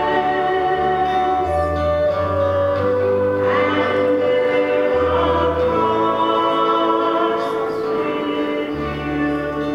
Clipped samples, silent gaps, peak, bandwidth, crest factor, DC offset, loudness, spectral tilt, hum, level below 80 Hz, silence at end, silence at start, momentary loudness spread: under 0.1%; none; -4 dBFS; 11 kHz; 14 dB; under 0.1%; -18 LUFS; -7 dB/octave; none; -40 dBFS; 0 s; 0 s; 5 LU